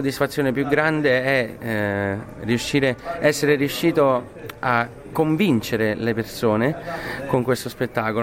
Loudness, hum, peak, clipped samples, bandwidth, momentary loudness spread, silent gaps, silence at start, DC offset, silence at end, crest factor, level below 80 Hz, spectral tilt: -21 LUFS; none; -4 dBFS; under 0.1%; 17 kHz; 7 LU; none; 0 s; under 0.1%; 0 s; 18 dB; -50 dBFS; -5.5 dB/octave